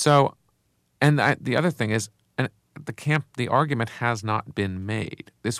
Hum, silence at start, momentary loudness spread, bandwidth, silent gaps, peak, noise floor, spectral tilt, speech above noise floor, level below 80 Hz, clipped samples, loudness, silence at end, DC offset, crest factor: none; 0 s; 12 LU; 14.5 kHz; none; -6 dBFS; -69 dBFS; -5.5 dB/octave; 45 dB; -62 dBFS; under 0.1%; -25 LUFS; 0 s; under 0.1%; 18 dB